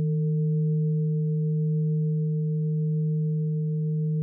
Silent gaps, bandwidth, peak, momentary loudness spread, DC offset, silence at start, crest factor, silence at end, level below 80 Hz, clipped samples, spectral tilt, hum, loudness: none; 0.5 kHz; -20 dBFS; 2 LU; under 0.1%; 0 s; 6 dB; 0 s; -72 dBFS; under 0.1%; -23 dB/octave; none; -26 LUFS